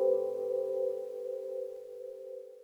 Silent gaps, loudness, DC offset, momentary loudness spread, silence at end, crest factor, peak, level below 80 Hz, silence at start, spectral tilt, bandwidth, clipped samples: none; -36 LUFS; under 0.1%; 13 LU; 0 s; 16 dB; -18 dBFS; under -90 dBFS; 0 s; -6.5 dB/octave; 6.8 kHz; under 0.1%